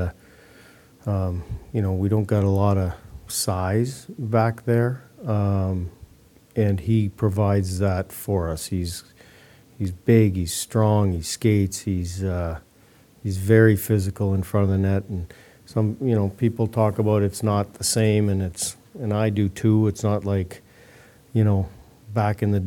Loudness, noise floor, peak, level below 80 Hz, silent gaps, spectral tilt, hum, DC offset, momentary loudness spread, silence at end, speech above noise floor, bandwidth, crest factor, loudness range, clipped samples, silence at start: -23 LUFS; -54 dBFS; -4 dBFS; -46 dBFS; none; -6.5 dB/octave; none; under 0.1%; 11 LU; 0 s; 32 dB; 17.5 kHz; 20 dB; 2 LU; under 0.1%; 0 s